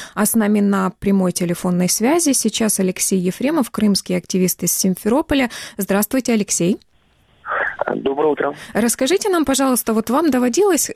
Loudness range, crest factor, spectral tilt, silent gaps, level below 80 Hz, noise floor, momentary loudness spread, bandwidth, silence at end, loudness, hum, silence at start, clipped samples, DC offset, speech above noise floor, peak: 3 LU; 16 dB; -4 dB/octave; none; -48 dBFS; -56 dBFS; 6 LU; 16 kHz; 0 s; -18 LUFS; none; 0 s; under 0.1%; under 0.1%; 39 dB; -2 dBFS